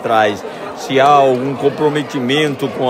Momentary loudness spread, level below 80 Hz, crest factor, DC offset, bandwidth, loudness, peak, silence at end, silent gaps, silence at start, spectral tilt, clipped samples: 12 LU; -62 dBFS; 14 dB; under 0.1%; 16 kHz; -14 LUFS; 0 dBFS; 0 s; none; 0 s; -5.5 dB/octave; under 0.1%